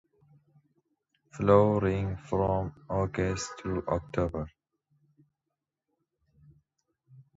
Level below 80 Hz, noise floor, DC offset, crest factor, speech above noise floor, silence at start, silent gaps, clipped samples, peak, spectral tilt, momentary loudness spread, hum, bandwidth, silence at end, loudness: -48 dBFS; -87 dBFS; under 0.1%; 22 dB; 59 dB; 1.35 s; none; under 0.1%; -8 dBFS; -7 dB/octave; 12 LU; none; 8 kHz; 0.15 s; -29 LUFS